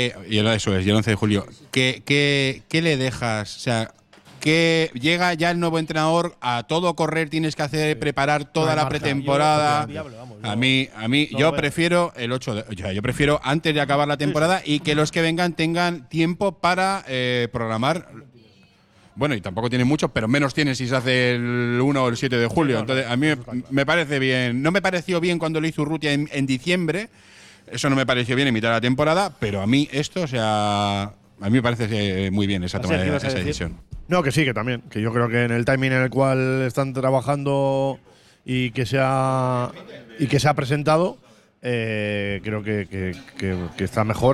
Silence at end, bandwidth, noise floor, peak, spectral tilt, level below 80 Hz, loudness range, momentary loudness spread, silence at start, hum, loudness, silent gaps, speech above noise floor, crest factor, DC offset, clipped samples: 0 s; 13.5 kHz; -55 dBFS; -6 dBFS; -5.5 dB/octave; -48 dBFS; 3 LU; 7 LU; 0 s; none; -21 LUFS; none; 33 dB; 16 dB; under 0.1%; under 0.1%